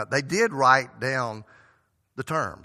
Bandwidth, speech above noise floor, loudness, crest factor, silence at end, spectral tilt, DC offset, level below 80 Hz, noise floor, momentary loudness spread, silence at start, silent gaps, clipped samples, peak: 14.5 kHz; 40 dB; -23 LUFS; 22 dB; 0.1 s; -4 dB/octave; under 0.1%; -64 dBFS; -65 dBFS; 19 LU; 0 s; none; under 0.1%; -4 dBFS